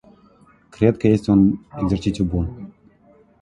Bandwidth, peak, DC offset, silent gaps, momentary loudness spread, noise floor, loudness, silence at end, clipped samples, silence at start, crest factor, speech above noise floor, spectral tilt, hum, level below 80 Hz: 10.5 kHz; 0 dBFS; under 0.1%; none; 13 LU; -53 dBFS; -19 LUFS; 0.7 s; under 0.1%; 0.8 s; 20 dB; 35 dB; -8.5 dB/octave; none; -38 dBFS